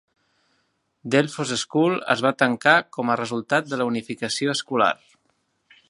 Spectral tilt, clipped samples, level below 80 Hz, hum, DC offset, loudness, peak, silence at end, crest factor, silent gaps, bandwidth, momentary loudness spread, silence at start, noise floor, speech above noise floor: -4 dB/octave; under 0.1%; -70 dBFS; none; under 0.1%; -22 LUFS; 0 dBFS; 0.95 s; 24 dB; none; 11.5 kHz; 8 LU; 1.05 s; -70 dBFS; 48 dB